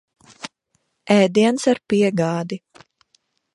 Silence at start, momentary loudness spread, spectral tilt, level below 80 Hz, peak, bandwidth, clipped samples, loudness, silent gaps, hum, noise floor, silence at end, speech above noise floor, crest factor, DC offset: 0.45 s; 21 LU; -5.5 dB/octave; -62 dBFS; -2 dBFS; 11.5 kHz; under 0.1%; -18 LUFS; none; none; -70 dBFS; 0.95 s; 52 dB; 18 dB; under 0.1%